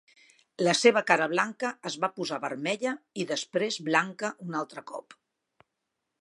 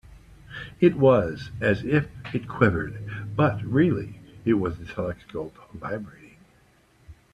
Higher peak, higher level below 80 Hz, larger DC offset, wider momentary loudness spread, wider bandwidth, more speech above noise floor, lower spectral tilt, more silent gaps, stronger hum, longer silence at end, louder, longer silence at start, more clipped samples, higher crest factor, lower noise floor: about the same, -4 dBFS vs -4 dBFS; second, -82 dBFS vs -50 dBFS; neither; second, 13 LU vs 19 LU; about the same, 11.5 kHz vs 10.5 kHz; first, 55 dB vs 36 dB; second, -3.5 dB/octave vs -8.5 dB/octave; neither; neither; first, 1.05 s vs 0.2 s; second, -28 LUFS vs -25 LUFS; first, 0.6 s vs 0.1 s; neither; about the same, 26 dB vs 22 dB; first, -83 dBFS vs -59 dBFS